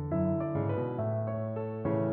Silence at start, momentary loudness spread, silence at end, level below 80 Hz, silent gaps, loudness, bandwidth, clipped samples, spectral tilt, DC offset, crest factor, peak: 0 s; 4 LU; 0 s; -60 dBFS; none; -32 LUFS; 3.6 kHz; under 0.1%; -10.5 dB/octave; under 0.1%; 12 dB; -20 dBFS